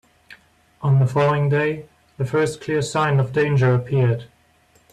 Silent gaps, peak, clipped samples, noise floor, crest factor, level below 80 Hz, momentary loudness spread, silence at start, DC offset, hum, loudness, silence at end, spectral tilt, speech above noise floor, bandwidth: none; -8 dBFS; under 0.1%; -57 dBFS; 14 dB; -54 dBFS; 8 LU; 0.3 s; under 0.1%; none; -20 LUFS; 0.65 s; -7 dB/octave; 39 dB; 11 kHz